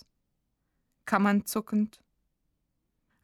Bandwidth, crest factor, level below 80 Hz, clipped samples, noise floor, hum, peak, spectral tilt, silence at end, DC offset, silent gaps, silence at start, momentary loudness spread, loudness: 15.5 kHz; 24 dB; -70 dBFS; under 0.1%; -78 dBFS; none; -10 dBFS; -5.5 dB/octave; 1.35 s; under 0.1%; none; 1.05 s; 9 LU; -28 LUFS